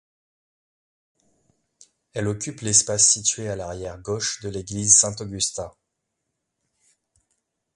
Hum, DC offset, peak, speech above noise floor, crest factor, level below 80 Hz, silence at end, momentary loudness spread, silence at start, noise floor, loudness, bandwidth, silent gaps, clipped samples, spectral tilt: none; under 0.1%; 0 dBFS; 56 dB; 26 dB; -54 dBFS; 2.05 s; 18 LU; 2.15 s; -79 dBFS; -20 LUFS; 11.5 kHz; none; under 0.1%; -2 dB/octave